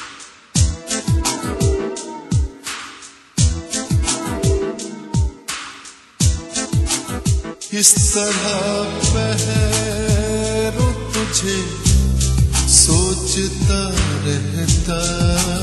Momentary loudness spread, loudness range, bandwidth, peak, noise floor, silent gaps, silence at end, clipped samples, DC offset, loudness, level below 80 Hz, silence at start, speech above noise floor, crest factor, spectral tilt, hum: 13 LU; 6 LU; 12.5 kHz; 0 dBFS; -39 dBFS; none; 0 s; under 0.1%; under 0.1%; -17 LUFS; -24 dBFS; 0 s; 22 dB; 18 dB; -4 dB/octave; none